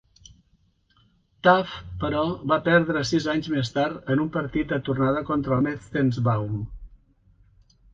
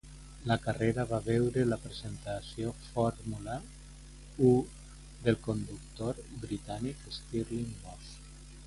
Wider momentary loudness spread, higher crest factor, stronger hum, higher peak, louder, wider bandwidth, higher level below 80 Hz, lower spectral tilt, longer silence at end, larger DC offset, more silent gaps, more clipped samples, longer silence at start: second, 8 LU vs 21 LU; about the same, 22 dB vs 22 dB; neither; first, -4 dBFS vs -10 dBFS; first, -24 LUFS vs -34 LUFS; second, 7.8 kHz vs 11.5 kHz; about the same, -48 dBFS vs -50 dBFS; about the same, -6.5 dB/octave vs -6.5 dB/octave; first, 1.05 s vs 0 s; neither; neither; neither; first, 1.45 s vs 0.05 s